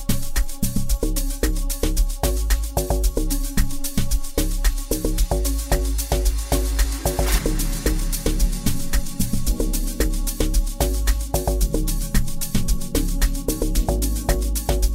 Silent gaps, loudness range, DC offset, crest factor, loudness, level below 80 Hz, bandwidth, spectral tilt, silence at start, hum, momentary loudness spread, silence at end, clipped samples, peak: none; 1 LU; 0.2%; 14 dB; -24 LUFS; -22 dBFS; 16.5 kHz; -4.5 dB/octave; 0 s; none; 3 LU; 0 s; under 0.1%; -6 dBFS